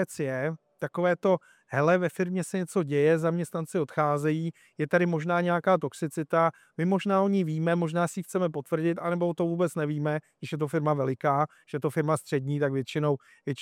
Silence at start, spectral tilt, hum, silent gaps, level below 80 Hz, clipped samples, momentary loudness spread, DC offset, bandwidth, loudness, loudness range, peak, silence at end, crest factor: 0 s; -7 dB/octave; none; none; -76 dBFS; under 0.1%; 8 LU; under 0.1%; 15 kHz; -28 LUFS; 2 LU; -10 dBFS; 0 s; 18 dB